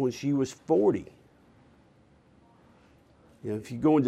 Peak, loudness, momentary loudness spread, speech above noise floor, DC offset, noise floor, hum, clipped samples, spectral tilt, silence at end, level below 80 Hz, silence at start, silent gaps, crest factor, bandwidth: -12 dBFS; -28 LUFS; 14 LU; 34 dB; under 0.1%; -60 dBFS; none; under 0.1%; -7.5 dB/octave; 0 s; -64 dBFS; 0 s; none; 18 dB; 12 kHz